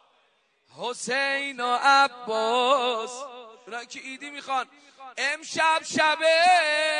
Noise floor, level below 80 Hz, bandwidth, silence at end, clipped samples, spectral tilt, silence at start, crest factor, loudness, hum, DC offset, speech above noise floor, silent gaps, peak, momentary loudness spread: -67 dBFS; -80 dBFS; 10.5 kHz; 0 s; under 0.1%; -1 dB/octave; 0.75 s; 18 dB; -23 LUFS; none; under 0.1%; 42 dB; none; -6 dBFS; 19 LU